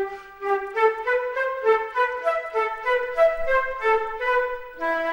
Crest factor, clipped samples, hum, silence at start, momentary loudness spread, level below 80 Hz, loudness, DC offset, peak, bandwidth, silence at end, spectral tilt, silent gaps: 16 dB; under 0.1%; none; 0 s; 6 LU; -48 dBFS; -23 LUFS; under 0.1%; -8 dBFS; 16 kHz; 0 s; -3.5 dB/octave; none